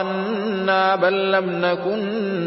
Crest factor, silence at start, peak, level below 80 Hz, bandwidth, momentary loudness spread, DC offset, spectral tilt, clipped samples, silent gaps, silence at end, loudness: 14 dB; 0 s; -6 dBFS; -66 dBFS; 5.8 kHz; 6 LU; under 0.1%; -10 dB/octave; under 0.1%; none; 0 s; -20 LUFS